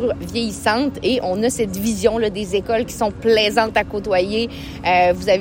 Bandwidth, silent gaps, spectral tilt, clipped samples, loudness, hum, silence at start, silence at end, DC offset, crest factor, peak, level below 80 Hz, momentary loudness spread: 16.5 kHz; none; -4 dB/octave; under 0.1%; -19 LUFS; none; 0 s; 0 s; under 0.1%; 16 dB; -2 dBFS; -42 dBFS; 7 LU